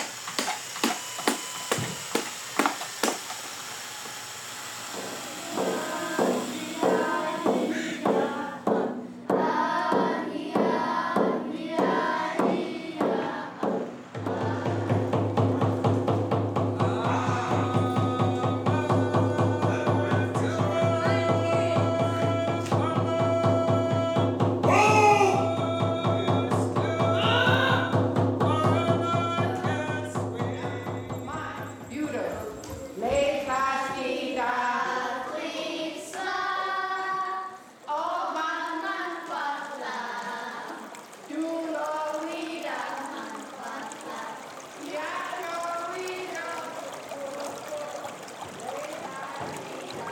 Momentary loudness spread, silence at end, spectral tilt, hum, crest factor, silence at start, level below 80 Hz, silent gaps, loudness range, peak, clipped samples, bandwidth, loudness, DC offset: 12 LU; 0 s; -5.5 dB/octave; none; 24 dB; 0 s; -62 dBFS; none; 11 LU; -2 dBFS; under 0.1%; 19 kHz; -27 LUFS; under 0.1%